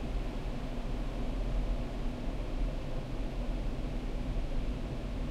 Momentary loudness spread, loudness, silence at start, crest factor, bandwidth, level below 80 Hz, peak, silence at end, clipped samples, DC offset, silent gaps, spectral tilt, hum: 3 LU; -39 LUFS; 0 s; 12 dB; 9.6 kHz; -36 dBFS; -22 dBFS; 0 s; under 0.1%; under 0.1%; none; -7 dB/octave; none